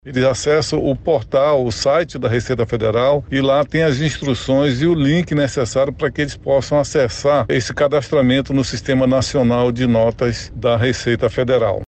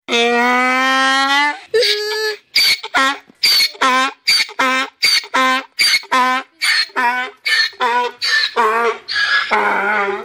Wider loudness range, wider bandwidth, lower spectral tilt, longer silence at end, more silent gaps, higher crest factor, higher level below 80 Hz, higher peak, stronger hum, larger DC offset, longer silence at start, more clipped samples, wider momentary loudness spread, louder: about the same, 1 LU vs 2 LU; second, 8.8 kHz vs over 20 kHz; first, -6 dB/octave vs 0 dB/octave; about the same, 0.05 s vs 0 s; neither; about the same, 12 dB vs 12 dB; first, -38 dBFS vs -64 dBFS; about the same, -4 dBFS vs -4 dBFS; neither; neither; about the same, 0.05 s vs 0.1 s; neither; about the same, 4 LU vs 5 LU; second, -17 LUFS vs -14 LUFS